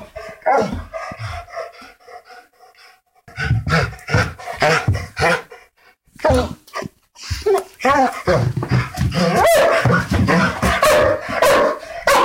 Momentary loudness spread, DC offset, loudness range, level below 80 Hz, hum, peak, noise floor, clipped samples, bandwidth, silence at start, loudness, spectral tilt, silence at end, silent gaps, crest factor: 16 LU; under 0.1%; 10 LU; -34 dBFS; none; -2 dBFS; -54 dBFS; under 0.1%; 16 kHz; 0 s; -17 LUFS; -5 dB/octave; 0 s; none; 16 dB